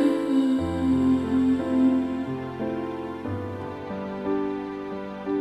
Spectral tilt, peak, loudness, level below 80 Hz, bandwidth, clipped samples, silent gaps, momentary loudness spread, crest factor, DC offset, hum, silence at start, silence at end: -8 dB/octave; -10 dBFS; -26 LUFS; -56 dBFS; 10 kHz; under 0.1%; none; 11 LU; 14 dB; under 0.1%; none; 0 s; 0 s